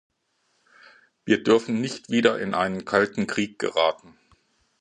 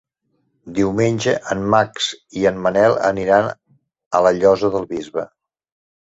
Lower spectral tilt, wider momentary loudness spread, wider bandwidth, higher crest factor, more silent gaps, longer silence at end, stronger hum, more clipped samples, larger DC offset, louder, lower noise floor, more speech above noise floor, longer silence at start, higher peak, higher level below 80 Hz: about the same, -5 dB/octave vs -5 dB/octave; second, 7 LU vs 11 LU; first, 10 kHz vs 8 kHz; about the same, 22 dB vs 18 dB; second, none vs 4.06-4.11 s; about the same, 0.85 s vs 0.8 s; neither; neither; neither; second, -23 LUFS vs -18 LUFS; about the same, -71 dBFS vs -68 dBFS; about the same, 48 dB vs 51 dB; first, 1.25 s vs 0.65 s; about the same, -2 dBFS vs -2 dBFS; second, -64 dBFS vs -50 dBFS